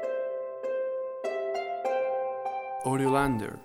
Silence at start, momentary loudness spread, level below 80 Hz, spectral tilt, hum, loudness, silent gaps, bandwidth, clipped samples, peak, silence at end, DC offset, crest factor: 0 s; 8 LU; -56 dBFS; -6.5 dB/octave; none; -30 LUFS; none; 15.5 kHz; under 0.1%; -10 dBFS; 0 s; under 0.1%; 20 dB